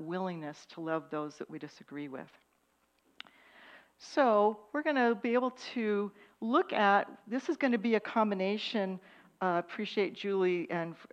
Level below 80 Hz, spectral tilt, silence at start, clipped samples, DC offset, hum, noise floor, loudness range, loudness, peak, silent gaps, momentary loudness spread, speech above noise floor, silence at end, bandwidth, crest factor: -84 dBFS; -6 dB/octave; 0 s; under 0.1%; under 0.1%; none; -74 dBFS; 12 LU; -32 LUFS; -14 dBFS; none; 17 LU; 41 dB; 0.05 s; 9.2 kHz; 18 dB